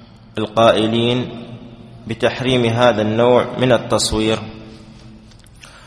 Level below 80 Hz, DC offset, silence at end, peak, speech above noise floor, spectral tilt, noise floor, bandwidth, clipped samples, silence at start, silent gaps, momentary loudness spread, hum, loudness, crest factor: -42 dBFS; under 0.1%; 0.2 s; 0 dBFS; 27 dB; -5 dB/octave; -42 dBFS; 11 kHz; under 0.1%; 0 s; none; 20 LU; none; -16 LUFS; 18 dB